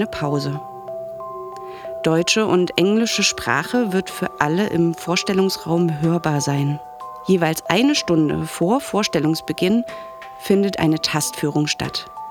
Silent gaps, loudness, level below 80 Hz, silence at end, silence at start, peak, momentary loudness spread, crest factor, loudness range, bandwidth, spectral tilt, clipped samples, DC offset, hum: none; -19 LUFS; -52 dBFS; 0 s; 0 s; 0 dBFS; 15 LU; 20 dB; 2 LU; 19.5 kHz; -4.5 dB/octave; under 0.1%; under 0.1%; none